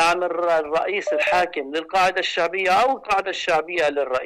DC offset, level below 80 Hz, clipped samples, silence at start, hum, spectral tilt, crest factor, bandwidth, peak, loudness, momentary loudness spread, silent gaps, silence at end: under 0.1%; -56 dBFS; under 0.1%; 0 s; none; -2.5 dB/octave; 10 dB; 15 kHz; -10 dBFS; -21 LUFS; 4 LU; none; 0 s